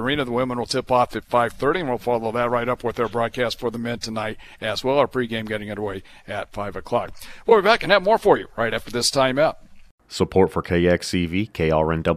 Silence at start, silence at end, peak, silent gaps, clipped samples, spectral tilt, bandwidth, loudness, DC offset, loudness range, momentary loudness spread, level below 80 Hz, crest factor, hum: 0 s; 0 s; -2 dBFS; 9.91-9.98 s; under 0.1%; -5 dB/octave; 15 kHz; -22 LUFS; under 0.1%; 6 LU; 12 LU; -44 dBFS; 20 dB; none